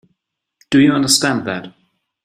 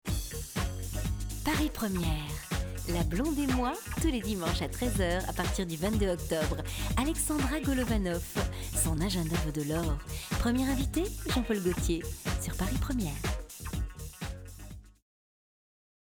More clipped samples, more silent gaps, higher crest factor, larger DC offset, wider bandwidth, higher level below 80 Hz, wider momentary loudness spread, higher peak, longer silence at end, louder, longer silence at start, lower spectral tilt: neither; neither; about the same, 18 dB vs 16 dB; neither; second, 15.5 kHz vs over 20 kHz; second, -54 dBFS vs -38 dBFS; first, 13 LU vs 8 LU; first, 0 dBFS vs -16 dBFS; second, 0.55 s vs 1.15 s; first, -14 LUFS vs -32 LUFS; first, 0.7 s vs 0.05 s; second, -3.5 dB/octave vs -5 dB/octave